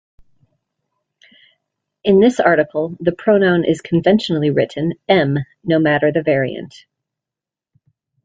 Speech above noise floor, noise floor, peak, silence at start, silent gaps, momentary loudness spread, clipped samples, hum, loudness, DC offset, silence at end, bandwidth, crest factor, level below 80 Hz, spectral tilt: 72 dB; -87 dBFS; -2 dBFS; 2.05 s; none; 10 LU; under 0.1%; none; -16 LUFS; under 0.1%; 1.55 s; 9.2 kHz; 16 dB; -56 dBFS; -7 dB/octave